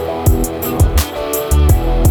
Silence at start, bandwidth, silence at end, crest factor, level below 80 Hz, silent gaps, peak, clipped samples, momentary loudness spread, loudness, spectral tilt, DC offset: 0 s; over 20 kHz; 0 s; 12 dB; -16 dBFS; none; 0 dBFS; under 0.1%; 6 LU; -15 LUFS; -6 dB/octave; under 0.1%